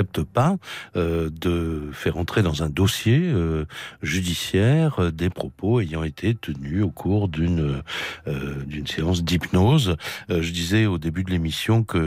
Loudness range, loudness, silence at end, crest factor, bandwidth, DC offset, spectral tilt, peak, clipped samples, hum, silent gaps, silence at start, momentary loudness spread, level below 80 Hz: 3 LU; -23 LUFS; 0 s; 14 dB; 16 kHz; under 0.1%; -6 dB/octave; -10 dBFS; under 0.1%; none; none; 0 s; 9 LU; -40 dBFS